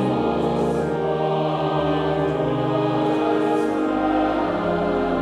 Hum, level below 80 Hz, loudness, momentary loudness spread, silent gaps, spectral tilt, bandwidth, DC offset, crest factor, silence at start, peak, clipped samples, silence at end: none; -44 dBFS; -21 LUFS; 2 LU; none; -7.5 dB/octave; 11 kHz; under 0.1%; 12 dB; 0 s; -8 dBFS; under 0.1%; 0 s